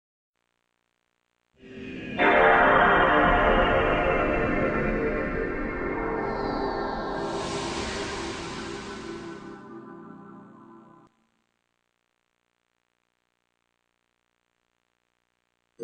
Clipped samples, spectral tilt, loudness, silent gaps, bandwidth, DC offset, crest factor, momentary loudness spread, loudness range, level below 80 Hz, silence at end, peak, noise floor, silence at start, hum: under 0.1%; -5 dB/octave; -24 LUFS; none; 10.5 kHz; under 0.1%; 22 dB; 23 LU; 18 LU; -40 dBFS; 0 s; -6 dBFS; -76 dBFS; 1.65 s; 60 Hz at -50 dBFS